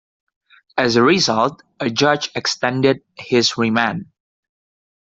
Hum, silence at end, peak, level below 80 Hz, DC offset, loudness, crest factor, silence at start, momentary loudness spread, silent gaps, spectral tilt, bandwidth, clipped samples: none; 1.15 s; -2 dBFS; -58 dBFS; under 0.1%; -17 LUFS; 16 dB; 0.75 s; 10 LU; none; -4 dB/octave; 7.8 kHz; under 0.1%